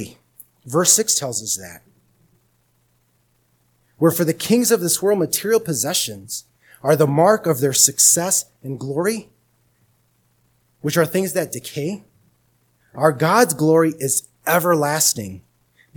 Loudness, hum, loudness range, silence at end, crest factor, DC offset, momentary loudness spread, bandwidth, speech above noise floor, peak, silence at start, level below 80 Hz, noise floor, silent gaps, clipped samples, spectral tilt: -18 LUFS; none; 9 LU; 0.55 s; 20 dB; under 0.1%; 15 LU; 19 kHz; 45 dB; 0 dBFS; 0 s; -64 dBFS; -63 dBFS; none; under 0.1%; -3.5 dB/octave